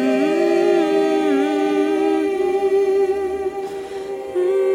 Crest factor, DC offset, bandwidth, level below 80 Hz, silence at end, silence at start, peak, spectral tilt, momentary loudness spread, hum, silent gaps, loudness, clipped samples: 12 dB; under 0.1%; 11.5 kHz; -56 dBFS; 0 s; 0 s; -6 dBFS; -5 dB/octave; 11 LU; none; none; -19 LUFS; under 0.1%